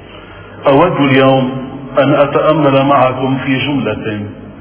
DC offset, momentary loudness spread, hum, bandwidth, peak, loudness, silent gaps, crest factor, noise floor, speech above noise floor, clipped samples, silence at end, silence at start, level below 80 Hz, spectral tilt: under 0.1%; 10 LU; none; 4 kHz; 0 dBFS; -12 LUFS; none; 12 dB; -32 dBFS; 22 dB; 0.2%; 0 s; 0 s; -42 dBFS; -10.5 dB/octave